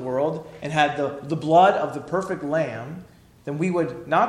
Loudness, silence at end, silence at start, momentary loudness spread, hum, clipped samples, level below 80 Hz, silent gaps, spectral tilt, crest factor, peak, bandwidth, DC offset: -23 LUFS; 0 s; 0 s; 17 LU; none; under 0.1%; -60 dBFS; none; -6.5 dB/octave; 18 dB; -6 dBFS; 11.5 kHz; under 0.1%